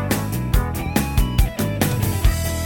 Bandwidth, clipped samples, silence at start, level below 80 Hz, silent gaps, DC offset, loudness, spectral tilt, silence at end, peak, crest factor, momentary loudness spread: 17.5 kHz; under 0.1%; 0 s; -24 dBFS; none; under 0.1%; -21 LUFS; -5.5 dB/octave; 0 s; -4 dBFS; 16 dB; 2 LU